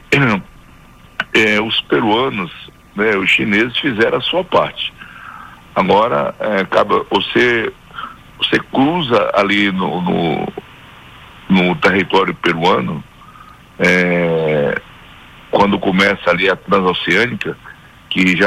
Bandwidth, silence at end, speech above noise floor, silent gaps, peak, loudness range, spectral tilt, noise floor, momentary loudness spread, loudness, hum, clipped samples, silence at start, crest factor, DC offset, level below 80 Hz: 15 kHz; 0 s; 27 dB; none; -2 dBFS; 2 LU; -5.5 dB/octave; -42 dBFS; 14 LU; -15 LUFS; none; under 0.1%; 0.1 s; 14 dB; under 0.1%; -46 dBFS